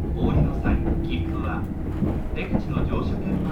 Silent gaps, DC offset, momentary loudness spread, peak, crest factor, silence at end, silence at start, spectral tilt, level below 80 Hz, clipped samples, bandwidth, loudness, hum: none; under 0.1%; 6 LU; -8 dBFS; 14 dB; 0 s; 0 s; -9 dB/octave; -28 dBFS; under 0.1%; 6.4 kHz; -26 LUFS; none